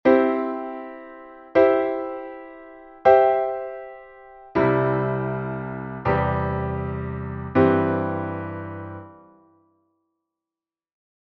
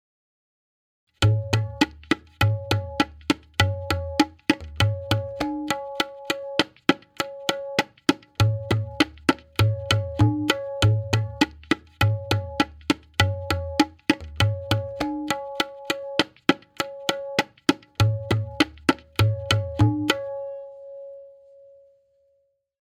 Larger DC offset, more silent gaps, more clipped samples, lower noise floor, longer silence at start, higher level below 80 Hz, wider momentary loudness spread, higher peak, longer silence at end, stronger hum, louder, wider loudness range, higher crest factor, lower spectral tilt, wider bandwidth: neither; neither; neither; first, under -90 dBFS vs -69 dBFS; second, 0.05 s vs 1.2 s; about the same, -46 dBFS vs -46 dBFS; first, 21 LU vs 6 LU; about the same, -2 dBFS vs 0 dBFS; first, 2.15 s vs 1.5 s; neither; first, -22 LUFS vs -25 LUFS; about the same, 4 LU vs 3 LU; about the same, 22 dB vs 24 dB; first, -10 dB/octave vs -5.5 dB/octave; second, 5.8 kHz vs 16 kHz